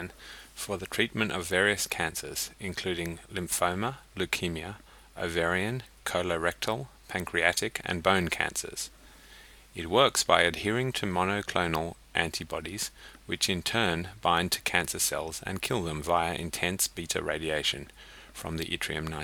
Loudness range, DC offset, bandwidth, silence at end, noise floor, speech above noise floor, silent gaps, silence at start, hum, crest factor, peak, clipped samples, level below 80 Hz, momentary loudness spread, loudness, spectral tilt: 4 LU; under 0.1%; 19.5 kHz; 0 s; -53 dBFS; 22 dB; none; 0 s; none; 26 dB; -4 dBFS; under 0.1%; -52 dBFS; 12 LU; -29 LUFS; -3 dB/octave